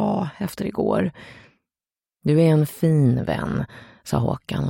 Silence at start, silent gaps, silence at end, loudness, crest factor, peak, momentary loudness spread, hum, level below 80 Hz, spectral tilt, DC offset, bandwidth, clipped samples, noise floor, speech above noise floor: 0 s; none; 0 s; -22 LUFS; 16 dB; -6 dBFS; 11 LU; none; -48 dBFS; -8 dB/octave; under 0.1%; 17 kHz; under 0.1%; under -90 dBFS; over 69 dB